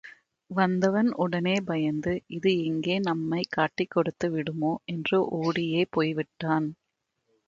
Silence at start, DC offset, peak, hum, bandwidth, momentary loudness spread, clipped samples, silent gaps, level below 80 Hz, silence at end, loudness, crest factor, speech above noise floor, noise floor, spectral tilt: 0.05 s; under 0.1%; -10 dBFS; none; 7.6 kHz; 5 LU; under 0.1%; none; -64 dBFS; 0.75 s; -27 LUFS; 18 dB; 53 dB; -80 dBFS; -6.5 dB/octave